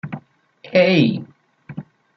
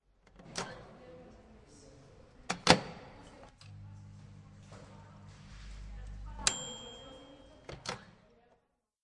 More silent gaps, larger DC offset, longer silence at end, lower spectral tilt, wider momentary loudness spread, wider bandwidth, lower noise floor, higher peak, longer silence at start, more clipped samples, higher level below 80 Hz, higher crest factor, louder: neither; neither; second, 0.35 s vs 0.9 s; first, -7.5 dB/octave vs -3 dB/octave; second, 22 LU vs 25 LU; second, 6.2 kHz vs 11.5 kHz; second, -39 dBFS vs -76 dBFS; about the same, -2 dBFS vs -4 dBFS; second, 0.05 s vs 0.35 s; neither; second, -62 dBFS vs -56 dBFS; second, 18 dB vs 38 dB; first, -17 LUFS vs -34 LUFS